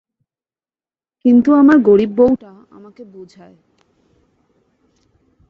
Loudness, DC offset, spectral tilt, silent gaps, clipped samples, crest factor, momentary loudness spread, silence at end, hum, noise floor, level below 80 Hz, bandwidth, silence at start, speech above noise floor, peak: -12 LUFS; under 0.1%; -8.5 dB/octave; none; under 0.1%; 16 dB; 8 LU; 2.25 s; none; under -90 dBFS; -54 dBFS; 6 kHz; 1.25 s; over 78 dB; -2 dBFS